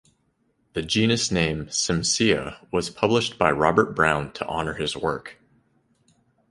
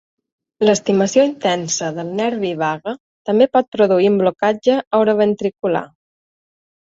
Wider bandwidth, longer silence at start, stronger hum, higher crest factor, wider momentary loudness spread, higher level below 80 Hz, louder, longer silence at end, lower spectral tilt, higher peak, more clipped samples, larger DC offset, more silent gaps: first, 11.5 kHz vs 7.8 kHz; first, 0.75 s vs 0.6 s; neither; first, 22 dB vs 16 dB; about the same, 9 LU vs 7 LU; first, -48 dBFS vs -60 dBFS; second, -23 LUFS vs -17 LUFS; first, 1.2 s vs 1 s; about the same, -4 dB/octave vs -4.5 dB/octave; about the same, -2 dBFS vs -2 dBFS; neither; neither; second, none vs 3.00-3.25 s, 3.68-3.72 s, 4.87-4.91 s